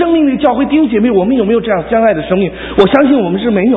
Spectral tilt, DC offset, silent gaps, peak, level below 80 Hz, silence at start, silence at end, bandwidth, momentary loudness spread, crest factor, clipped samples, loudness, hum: -9 dB/octave; under 0.1%; none; 0 dBFS; -38 dBFS; 0 s; 0 s; 4.8 kHz; 4 LU; 10 dB; 0.2%; -11 LUFS; none